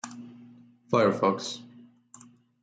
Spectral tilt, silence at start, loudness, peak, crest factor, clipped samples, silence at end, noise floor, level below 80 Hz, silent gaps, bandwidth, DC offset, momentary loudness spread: -5 dB/octave; 0.05 s; -26 LUFS; -10 dBFS; 20 dB; under 0.1%; 0.95 s; -55 dBFS; -74 dBFS; none; 9.4 kHz; under 0.1%; 21 LU